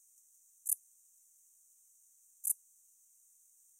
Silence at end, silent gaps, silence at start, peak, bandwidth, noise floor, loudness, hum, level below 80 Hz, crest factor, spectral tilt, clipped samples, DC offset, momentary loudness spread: 1.25 s; none; 0.65 s; -14 dBFS; 16 kHz; -67 dBFS; -37 LUFS; none; under -90 dBFS; 32 dB; 6 dB/octave; under 0.1%; under 0.1%; 4 LU